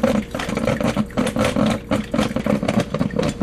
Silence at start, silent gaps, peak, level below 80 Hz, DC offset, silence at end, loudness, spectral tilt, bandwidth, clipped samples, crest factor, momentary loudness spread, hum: 0 s; none; -2 dBFS; -38 dBFS; under 0.1%; 0 s; -21 LUFS; -6 dB/octave; 14 kHz; under 0.1%; 18 dB; 3 LU; none